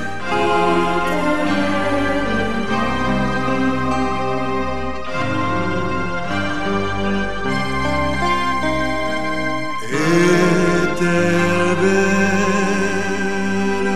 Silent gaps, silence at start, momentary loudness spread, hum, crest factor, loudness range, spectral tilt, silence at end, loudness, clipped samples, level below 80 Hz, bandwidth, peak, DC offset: none; 0 s; 6 LU; none; 16 dB; 5 LU; -5.5 dB/octave; 0 s; -19 LUFS; under 0.1%; -38 dBFS; 14 kHz; -2 dBFS; 6%